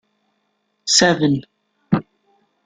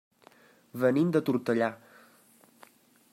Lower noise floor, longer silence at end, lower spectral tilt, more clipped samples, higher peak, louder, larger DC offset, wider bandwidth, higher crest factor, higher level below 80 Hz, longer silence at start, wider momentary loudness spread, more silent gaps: first, -69 dBFS vs -61 dBFS; second, 0.65 s vs 1.35 s; second, -3.5 dB/octave vs -7.5 dB/octave; neither; first, -2 dBFS vs -12 dBFS; first, -17 LUFS vs -28 LUFS; neither; second, 11 kHz vs 16 kHz; about the same, 20 dB vs 20 dB; first, -56 dBFS vs -78 dBFS; about the same, 0.85 s vs 0.75 s; second, 11 LU vs 16 LU; neither